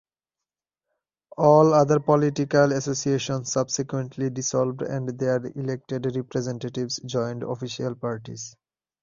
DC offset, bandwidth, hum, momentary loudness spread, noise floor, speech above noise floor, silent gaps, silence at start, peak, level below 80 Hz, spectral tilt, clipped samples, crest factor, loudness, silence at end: under 0.1%; 7.4 kHz; none; 13 LU; -89 dBFS; 66 dB; none; 1.4 s; -4 dBFS; -62 dBFS; -5.5 dB/octave; under 0.1%; 20 dB; -24 LUFS; 0.5 s